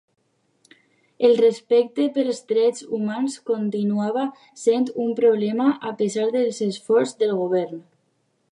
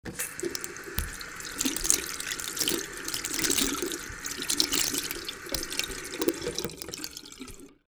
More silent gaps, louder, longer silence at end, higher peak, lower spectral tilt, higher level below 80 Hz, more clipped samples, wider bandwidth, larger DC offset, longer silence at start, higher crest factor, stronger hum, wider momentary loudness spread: neither; first, -22 LUFS vs -29 LUFS; first, 0.75 s vs 0.15 s; second, -6 dBFS vs 0 dBFS; first, -5.5 dB/octave vs -1.5 dB/octave; second, -78 dBFS vs -48 dBFS; neither; second, 11 kHz vs over 20 kHz; neither; first, 1.2 s vs 0.05 s; second, 16 dB vs 32 dB; neither; second, 8 LU vs 12 LU